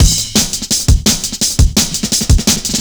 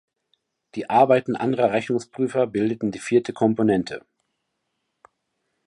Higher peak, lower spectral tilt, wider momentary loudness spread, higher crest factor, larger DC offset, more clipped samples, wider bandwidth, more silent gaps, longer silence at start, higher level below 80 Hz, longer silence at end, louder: first, 0 dBFS vs -4 dBFS; second, -3 dB/octave vs -6.5 dB/octave; second, 3 LU vs 12 LU; second, 12 dB vs 20 dB; neither; neither; first, over 20 kHz vs 11.5 kHz; neither; second, 0 s vs 0.75 s; first, -16 dBFS vs -62 dBFS; second, 0 s vs 1.7 s; first, -12 LUFS vs -22 LUFS